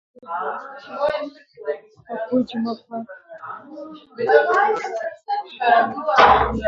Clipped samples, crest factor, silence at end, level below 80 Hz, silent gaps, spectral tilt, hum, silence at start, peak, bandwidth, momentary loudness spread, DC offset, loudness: under 0.1%; 20 dB; 0 s; -44 dBFS; none; -5.5 dB/octave; none; 0.25 s; 0 dBFS; 7.6 kHz; 21 LU; under 0.1%; -20 LUFS